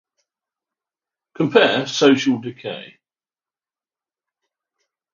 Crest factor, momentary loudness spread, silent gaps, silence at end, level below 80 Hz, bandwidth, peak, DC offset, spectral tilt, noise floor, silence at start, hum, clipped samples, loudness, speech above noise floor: 22 dB; 16 LU; none; 2.25 s; -72 dBFS; 7.4 kHz; 0 dBFS; under 0.1%; -4.5 dB/octave; under -90 dBFS; 1.4 s; none; under 0.1%; -17 LUFS; over 73 dB